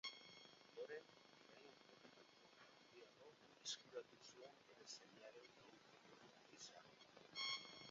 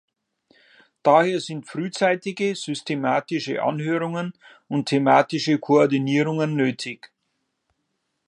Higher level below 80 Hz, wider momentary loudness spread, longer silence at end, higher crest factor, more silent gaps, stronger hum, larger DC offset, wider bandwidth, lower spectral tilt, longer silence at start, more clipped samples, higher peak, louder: second, under -90 dBFS vs -74 dBFS; first, 17 LU vs 12 LU; second, 0 s vs 1.2 s; about the same, 24 dB vs 20 dB; neither; neither; neither; second, 7.4 kHz vs 10.5 kHz; second, 0.5 dB/octave vs -6 dB/octave; second, 0.05 s vs 1.05 s; neither; second, -34 dBFS vs -2 dBFS; second, -57 LUFS vs -22 LUFS